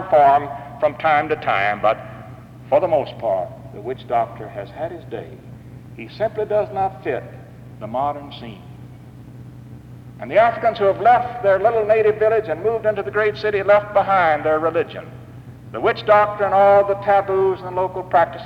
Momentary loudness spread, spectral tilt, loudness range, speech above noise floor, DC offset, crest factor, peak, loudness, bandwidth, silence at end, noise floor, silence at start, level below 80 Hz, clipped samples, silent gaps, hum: 23 LU; -7 dB/octave; 9 LU; 21 dB; under 0.1%; 16 dB; -4 dBFS; -18 LUFS; 6.4 kHz; 0 s; -39 dBFS; 0 s; -52 dBFS; under 0.1%; none; none